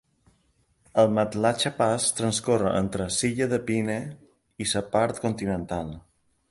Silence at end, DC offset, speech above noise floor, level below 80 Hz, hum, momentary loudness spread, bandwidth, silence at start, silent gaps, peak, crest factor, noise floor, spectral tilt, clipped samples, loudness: 0.5 s; under 0.1%; 42 dB; -52 dBFS; none; 10 LU; 11.5 kHz; 0.95 s; none; -8 dBFS; 18 dB; -67 dBFS; -4.5 dB/octave; under 0.1%; -25 LUFS